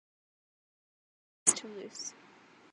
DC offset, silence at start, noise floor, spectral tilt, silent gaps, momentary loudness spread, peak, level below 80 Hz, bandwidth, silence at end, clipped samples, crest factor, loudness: under 0.1%; 1.45 s; -59 dBFS; -0.5 dB/octave; none; 16 LU; -8 dBFS; -86 dBFS; 11 kHz; 0.6 s; under 0.1%; 32 dB; -31 LUFS